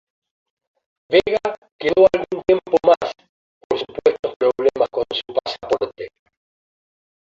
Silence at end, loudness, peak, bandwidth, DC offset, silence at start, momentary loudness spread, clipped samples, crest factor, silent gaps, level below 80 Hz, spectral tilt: 1.3 s; -19 LUFS; 0 dBFS; 7.6 kHz; under 0.1%; 1.1 s; 11 LU; under 0.1%; 20 dB; 1.58-1.62 s, 1.72-1.79 s, 3.29-3.70 s, 4.19-4.23 s, 4.36-4.40 s; -54 dBFS; -5 dB/octave